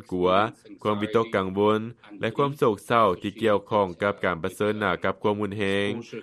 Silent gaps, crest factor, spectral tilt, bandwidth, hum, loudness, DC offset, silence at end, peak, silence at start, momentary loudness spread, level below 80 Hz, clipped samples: none; 18 dB; -6.5 dB/octave; 13 kHz; none; -25 LUFS; under 0.1%; 0 s; -6 dBFS; 0.1 s; 7 LU; -60 dBFS; under 0.1%